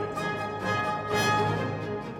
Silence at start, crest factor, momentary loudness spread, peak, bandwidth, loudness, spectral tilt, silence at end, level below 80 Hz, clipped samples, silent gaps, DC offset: 0 s; 16 dB; 7 LU; -14 dBFS; 18.5 kHz; -28 LUFS; -5 dB/octave; 0 s; -56 dBFS; under 0.1%; none; under 0.1%